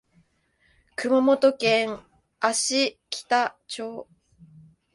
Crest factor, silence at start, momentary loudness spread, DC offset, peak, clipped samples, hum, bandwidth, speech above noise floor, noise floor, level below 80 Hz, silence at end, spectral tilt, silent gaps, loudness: 20 dB; 1 s; 16 LU; under 0.1%; -6 dBFS; under 0.1%; none; 11.5 kHz; 43 dB; -66 dBFS; -68 dBFS; 0.9 s; -2.5 dB/octave; none; -24 LUFS